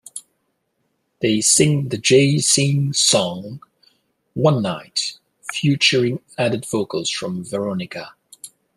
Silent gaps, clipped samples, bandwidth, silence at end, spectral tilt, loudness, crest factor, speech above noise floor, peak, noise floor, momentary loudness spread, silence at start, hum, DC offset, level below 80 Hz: none; under 0.1%; 13 kHz; 0.3 s; -3.5 dB/octave; -18 LUFS; 18 dB; 52 dB; -2 dBFS; -70 dBFS; 21 LU; 0.15 s; none; under 0.1%; -58 dBFS